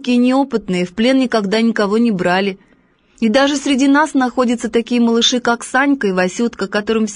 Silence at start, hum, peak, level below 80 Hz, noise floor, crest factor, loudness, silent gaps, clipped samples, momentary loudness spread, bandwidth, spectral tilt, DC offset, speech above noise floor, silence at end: 0 s; none; -2 dBFS; -52 dBFS; -54 dBFS; 12 dB; -15 LUFS; none; under 0.1%; 6 LU; 10.5 kHz; -4.5 dB/octave; under 0.1%; 39 dB; 0 s